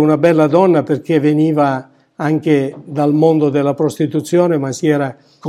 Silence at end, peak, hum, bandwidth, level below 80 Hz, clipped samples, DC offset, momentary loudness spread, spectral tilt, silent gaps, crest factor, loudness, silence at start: 0 s; 0 dBFS; none; 13 kHz; -66 dBFS; under 0.1%; under 0.1%; 7 LU; -7.5 dB/octave; none; 14 dB; -14 LUFS; 0 s